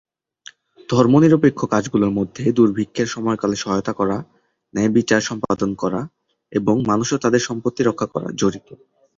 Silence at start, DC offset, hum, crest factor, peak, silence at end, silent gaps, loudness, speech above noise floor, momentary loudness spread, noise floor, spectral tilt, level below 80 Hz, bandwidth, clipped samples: 0.9 s; under 0.1%; none; 18 dB; -2 dBFS; 0.45 s; none; -19 LUFS; 28 dB; 10 LU; -46 dBFS; -6 dB/octave; -52 dBFS; 7.8 kHz; under 0.1%